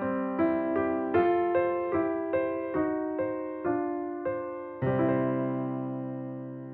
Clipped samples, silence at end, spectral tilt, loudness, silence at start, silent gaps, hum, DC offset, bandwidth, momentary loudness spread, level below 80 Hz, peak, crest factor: under 0.1%; 0 s; -7.5 dB/octave; -30 LUFS; 0 s; none; none; under 0.1%; 4.1 kHz; 9 LU; -66 dBFS; -12 dBFS; 18 dB